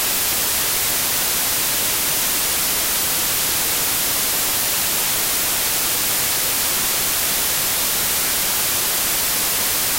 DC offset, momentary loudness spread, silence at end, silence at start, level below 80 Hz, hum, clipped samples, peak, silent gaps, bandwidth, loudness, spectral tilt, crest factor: under 0.1%; 0 LU; 0 s; 0 s; -44 dBFS; none; under 0.1%; -8 dBFS; none; 16.5 kHz; -17 LUFS; 0 dB/octave; 12 dB